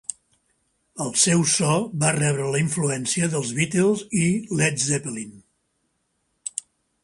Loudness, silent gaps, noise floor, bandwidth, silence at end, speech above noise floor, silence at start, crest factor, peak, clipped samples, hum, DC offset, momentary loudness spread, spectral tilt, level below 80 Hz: -22 LUFS; none; -72 dBFS; 11.5 kHz; 0.45 s; 50 dB; 0.1 s; 20 dB; -4 dBFS; under 0.1%; none; under 0.1%; 15 LU; -4 dB/octave; -60 dBFS